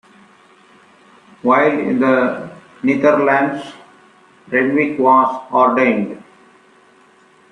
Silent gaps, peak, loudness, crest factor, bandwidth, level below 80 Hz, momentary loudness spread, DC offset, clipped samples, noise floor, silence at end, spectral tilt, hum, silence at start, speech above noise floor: none; -2 dBFS; -15 LUFS; 16 dB; 9.6 kHz; -64 dBFS; 15 LU; under 0.1%; under 0.1%; -50 dBFS; 1.3 s; -7 dB/octave; none; 1.45 s; 35 dB